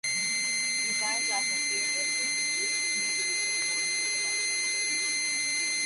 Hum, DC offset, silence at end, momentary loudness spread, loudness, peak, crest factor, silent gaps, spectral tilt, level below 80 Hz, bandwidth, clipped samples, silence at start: none; under 0.1%; 0 s; 0 LU; -26 LUFS; -18 dBFS; 12 dB; none; 2 dB/octave; -78 dBFS; 11.5 kHz; under 0.1%; 0.05 s